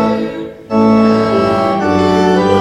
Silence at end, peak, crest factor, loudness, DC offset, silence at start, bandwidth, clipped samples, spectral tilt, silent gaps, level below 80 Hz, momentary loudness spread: 0 s; 0 dBFS; 12 dB; -12 LUFS; under 0.1%; 0 s; 11 kHz; under 0.1%; -7 dB/octave; none; -42 dBFS; 8 LU